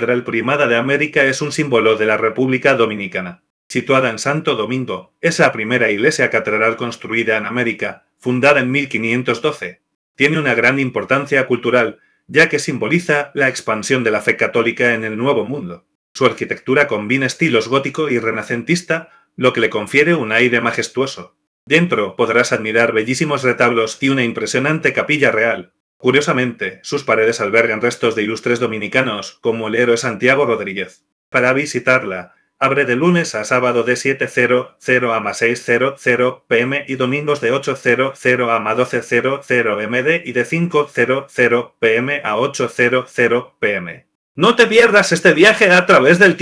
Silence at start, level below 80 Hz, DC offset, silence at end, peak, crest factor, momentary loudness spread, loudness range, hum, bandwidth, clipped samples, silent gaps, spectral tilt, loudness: 0 s; -62 dBFS; under 0.1%; 0 s; 0 dBFS; 16 dB; 8 LU; 2 LU; none; 11 kHz; under 0.1%; 3.50-3.70 s, 9.95-10.15 s, 15.95-16.15 s, 21.47-21.67 s, 25.80-26.00 s, 31.12-31.32 s, 44.15-44.35 s; -4.5 dB/octave; -15 LUFS